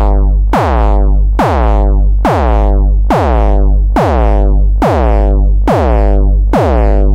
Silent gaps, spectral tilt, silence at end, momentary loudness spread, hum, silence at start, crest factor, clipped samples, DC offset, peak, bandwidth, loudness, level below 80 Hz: none; -8.5 dB/octave; 0 s; 1 LU; 50 Hz at -15 dBFS; 0 s; 8 dB; 0.3%; under 0.1%; 0 dBFS; 5.6 kHz; -11 LUFS; -10 dBFS